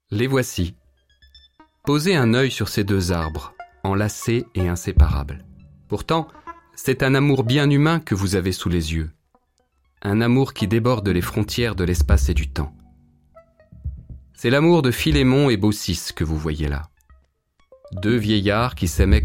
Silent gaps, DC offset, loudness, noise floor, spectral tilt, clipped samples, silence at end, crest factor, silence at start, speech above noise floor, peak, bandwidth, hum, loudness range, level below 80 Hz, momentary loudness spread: none; under 0.1%; -20 LUFS; -65 dBFS; -6 dB/octave; under 0.1%; 0 s; 18 dB; 0.1 s; 46 dB; -4 dBFS; 16.5 kHz; none; 3 LU; -30 dBFS; 14 LU